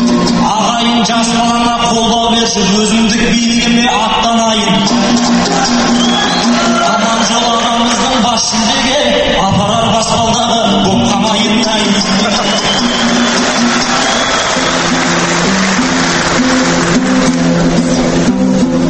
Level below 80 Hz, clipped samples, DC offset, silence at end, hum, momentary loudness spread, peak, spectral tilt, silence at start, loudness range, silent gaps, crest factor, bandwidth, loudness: -32 dBFS; under 0.1%; under 0.1%; 0 s; none; 1 LU; 0 dBFS; -3.5 dB/octave; 0 s; 1 LU; none; 10 dB; 8.8 kHz; -10 LUFS